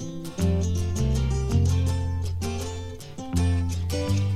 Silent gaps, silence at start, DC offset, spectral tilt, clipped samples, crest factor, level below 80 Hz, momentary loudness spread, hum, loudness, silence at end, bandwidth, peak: none; 0 s; 0.7%; -6.5 dB/octave; under 0.1%; 14 dB; -34 dBFS; 10 LU; none; -26 LUFS; 0 s; 14 kHz; -10 dBFS